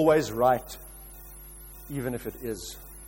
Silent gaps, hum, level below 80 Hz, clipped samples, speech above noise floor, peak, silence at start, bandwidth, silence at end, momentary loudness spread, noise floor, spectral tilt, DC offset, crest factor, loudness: none; none; -48 dBFS; under 0.1%; 19 dB; -10 dBFS; 0 s; 16.5 kHz; 0 s; 21 LU; -45 dBFS; -5.5 dB/octave; under 0.1%; 20 dB; -28 LUFS